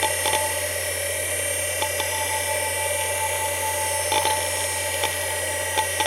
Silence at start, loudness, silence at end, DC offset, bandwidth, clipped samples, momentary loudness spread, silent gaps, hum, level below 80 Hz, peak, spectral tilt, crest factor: 0 s; -23 LUFS; 0 s; under 0.1%; 17 kHz; under 0.1%; 3 LU; none; none; -54 dBFS; -6 dBFS; -1 dB/octave; 18 dB